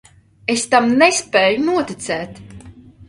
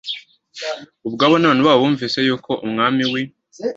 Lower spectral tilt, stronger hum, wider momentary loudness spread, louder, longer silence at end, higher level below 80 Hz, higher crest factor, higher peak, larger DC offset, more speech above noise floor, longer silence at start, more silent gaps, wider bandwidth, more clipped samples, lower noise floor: second, -3 dB/octave vs -5.5 dB/octave; neither; second, 12 LU vs 16 LU; about the same, -16 LUFS vs -17 LUFS; about the same, 0.05 s vs 0.05 s; first, -52 dBFS vs -60 dBFS; about the same, 18 dB vs 18 dB; about the same, 0 dBFS vs 0 dBFS; neither; first, 25 dB vs 20 dB; first, 0.5 s vs 0.05 s; neither; first, 11.5 kHz vs 7.8 kHz; neither; first, -41 dBFS vs -37 dBFS